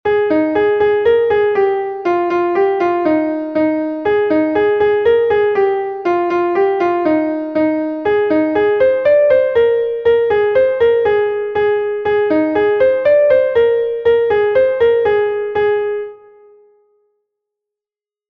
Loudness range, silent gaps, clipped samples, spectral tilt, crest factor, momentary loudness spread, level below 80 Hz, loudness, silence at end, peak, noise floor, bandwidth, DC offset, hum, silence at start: 3 LU; none; under 0.1%; -7.5 dB/octave; 12 dB; 5 LU; -50 dBFS; -14 LUFS; 2.15 s; -2 dBFS; under -90 dBFS; 5.6 kHz; under 0.1%; none; 0.05 s